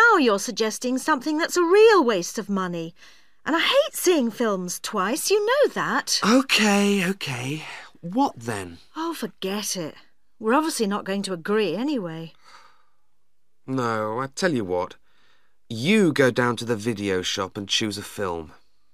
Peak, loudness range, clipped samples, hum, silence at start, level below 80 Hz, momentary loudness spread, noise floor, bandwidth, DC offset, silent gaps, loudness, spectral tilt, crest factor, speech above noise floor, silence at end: -4 dBFS; 8 LU; under 0.1%; none; 0 s; -64 dBFS; 13 LU; -78 dBFS; 15.5 kHz; 0.3%; none; -23 LUFS; -4 dB/octave; 18 dB; 55 dB; 0.45 s